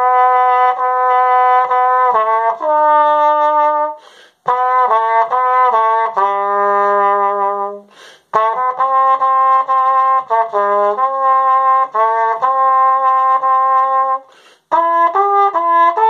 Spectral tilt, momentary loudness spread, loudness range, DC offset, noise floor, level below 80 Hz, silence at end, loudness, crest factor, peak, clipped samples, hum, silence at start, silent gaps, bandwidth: -4 dB/octave; 5 LU; 2 LU; under 0.1%; -46 dBFS; -76 dBFS; 0 s; -13 LUFS; 12 dB; 0 dBFS; under 0.1%; none; 0 s; none; 6.8 kHz